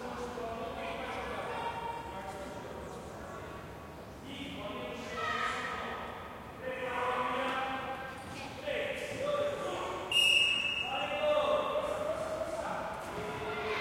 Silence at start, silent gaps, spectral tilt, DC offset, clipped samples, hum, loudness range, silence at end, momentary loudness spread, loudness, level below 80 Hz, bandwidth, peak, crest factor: 0 s; none; -3 dB/octave; under 0.1%; under 0.1%; none; 12 LU; 0 s; 14 LU; -34 LUFS; -58 dBFS; 16.5 kHz; -16 dBFS; 20 dB